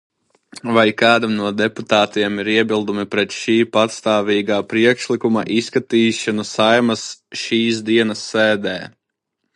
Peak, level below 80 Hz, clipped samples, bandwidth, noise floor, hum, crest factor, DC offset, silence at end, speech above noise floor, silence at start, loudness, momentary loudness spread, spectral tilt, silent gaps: 0 dBFS; -60 dBFS; under 0.1%; 11 kHz; -76 dBFS; none; 18 dB; under 0.1%; 0.65 s; 59 dB; 0.55 s; -17 LUFS; 7 LU; -4.5 dB/octave; none